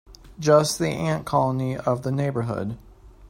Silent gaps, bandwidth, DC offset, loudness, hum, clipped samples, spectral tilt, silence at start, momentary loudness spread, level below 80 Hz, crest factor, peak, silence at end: none; 16 kHz; under 0.1%; -23 LUFS; none; under 0.1%; -5.5 dB/octave; 0.1 s; 11 LU; -50 dBFS; 18 dB; -6 dBFS; 0 s